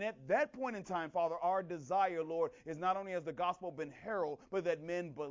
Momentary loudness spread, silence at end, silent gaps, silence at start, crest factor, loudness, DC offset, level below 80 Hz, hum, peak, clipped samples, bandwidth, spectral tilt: 7 LU; 0 s; none; 0 s; 16 dB; -38 LUFS; under 0.1%; -76 dBFS; none; -22 dBFS; under 0.1%; 7.6 kHz; -6 dB/octave